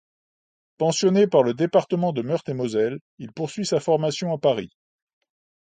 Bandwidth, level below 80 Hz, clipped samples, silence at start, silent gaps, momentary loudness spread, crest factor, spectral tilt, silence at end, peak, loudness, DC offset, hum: 9.4 kHz; -66 dBFS; under 0.1%; 0.8 s; 3.01-3.17 s; 12 LU; 18 dB; -5.5 dB/octave; 1.05 s; -4 dBFS; -22 LUFS; under 0.1%; none